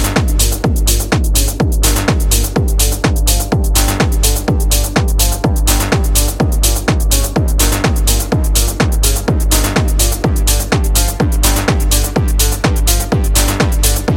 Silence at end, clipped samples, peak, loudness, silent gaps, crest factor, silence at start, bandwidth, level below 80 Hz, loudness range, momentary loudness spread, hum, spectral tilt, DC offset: 0 s; under 0.1%; 0 dBFS; -13 LUFS; none; 12 dB; 0 s; 17 kHz; -14 dBFS; 0 LU; 2 LU; none; -4 dB/octave; under 0.1%